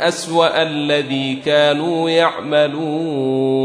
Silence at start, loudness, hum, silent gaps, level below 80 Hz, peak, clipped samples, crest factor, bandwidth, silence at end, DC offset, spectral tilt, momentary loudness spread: 0 s; -17 LUFS; none; none; -66 dBFS; -2 dBFS; under 0.1%; 16 dB; 11 kHz; 0 s; under 0.1%; -5 dB/octave; 5 LU